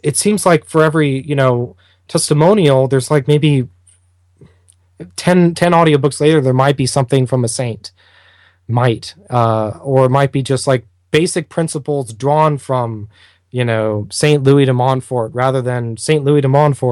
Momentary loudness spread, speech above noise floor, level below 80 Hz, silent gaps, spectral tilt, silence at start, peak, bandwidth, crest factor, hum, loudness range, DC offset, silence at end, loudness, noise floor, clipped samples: 9 LU; 40 dB; -52 dBFS; none; -6 dB/octave; 0.05 s; 0 dBFS; 12.5 kHz; 14 dB; none; 3 LU; under 0.1%; 0 s; -14 LUFS; -53 dBFS; under 0.1%